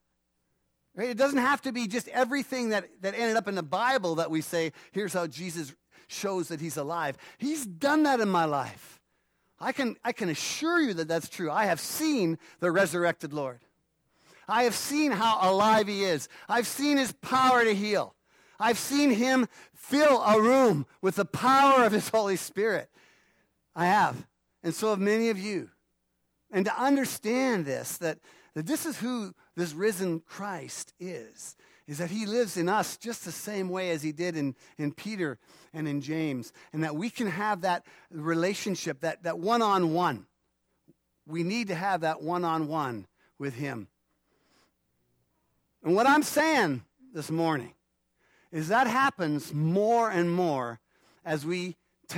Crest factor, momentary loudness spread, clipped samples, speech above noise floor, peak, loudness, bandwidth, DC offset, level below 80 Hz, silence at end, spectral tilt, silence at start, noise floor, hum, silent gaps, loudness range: 18 dB; 14 LU; under 0.1%; 49 dB; -10 dBFS; -28 LUFS; 17.5 kHz; under 0.1%; -74 dBFS; 0 s; -4.5 dB/octave; 0.95 s; -77 dBFS; none; none; 8 LU